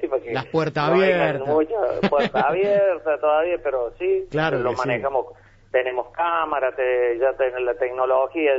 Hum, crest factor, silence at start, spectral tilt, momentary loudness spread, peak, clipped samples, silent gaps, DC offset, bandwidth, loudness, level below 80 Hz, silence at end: none; 16 dB; 0 s; -7 dB/octave; 6 LU; -6 dBFS; under 0.1%; none; under 0.1%; 7.8 kHz; -21 LUFS; -52 dBFS; 0 s